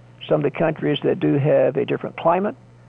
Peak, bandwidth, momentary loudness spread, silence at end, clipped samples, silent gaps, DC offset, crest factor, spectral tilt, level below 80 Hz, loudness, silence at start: -6 dBFS; 4 kHz; 6 LU; 0.35 s; under 0.1%; none; under 0.1%; 14 dB; -9.5 dB/octave; -58 dBFS; -20 LUFS; 0.2 s